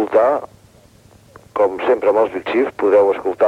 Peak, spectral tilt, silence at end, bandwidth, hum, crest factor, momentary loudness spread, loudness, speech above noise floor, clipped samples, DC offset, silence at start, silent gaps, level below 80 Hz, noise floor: -2 dBFS; -6 dB/octave; 0 s; 9.4 kHz; none; 14 dB; 5 LU; -17 LUFS; 32 dB; under 0.1%; under 0.1%; 0 s; none; -56 dBFS; -48 dBFS